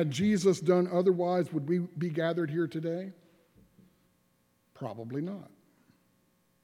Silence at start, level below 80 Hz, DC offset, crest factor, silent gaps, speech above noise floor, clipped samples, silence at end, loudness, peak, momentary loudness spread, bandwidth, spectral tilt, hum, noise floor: 0 s; -72 dBFS; under 0.1%; 18 dB; none; 42 dB; under 0.1%; 1.2 s; -30 LUFS; -14 dBFS; 15 LU; 13 kHz; -7 dB/octave; none; -71 dBFS